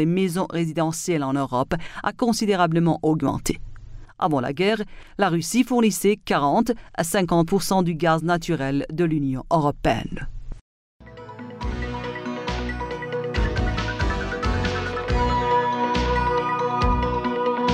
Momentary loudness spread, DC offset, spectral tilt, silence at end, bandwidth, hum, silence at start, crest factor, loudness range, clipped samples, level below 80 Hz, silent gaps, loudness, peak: 9 LU; under 0.1%; -5.5 dB/octave; 0 s; 16 kHz; none; 0 s; 16 dB; 6 LU; under 0.1%; -34 dBFS; 10.61-11.00 s; -23 LUFS; -6 dBFS